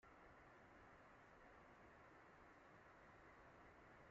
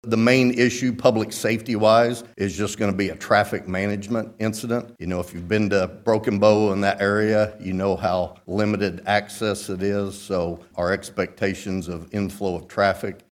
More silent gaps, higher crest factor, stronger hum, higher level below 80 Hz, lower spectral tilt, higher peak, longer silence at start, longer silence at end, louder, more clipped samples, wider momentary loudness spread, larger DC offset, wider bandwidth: neither; second, 12 dB vs 20 dB; neither; second, -80 dBFS vs -52 dBFS; second, -4 dB/octave vs -5.5 dB/octave; second, -54 dBFS vs -2 dBFS; about the same, 0 s vs 0.05 s; second, 0 s vs 0.15 s; second, -67 LUFS vs -22 LUFS; neither; second, 1 LU vs 11 LU; neither; second, 7.4 kHz vs 16 kHz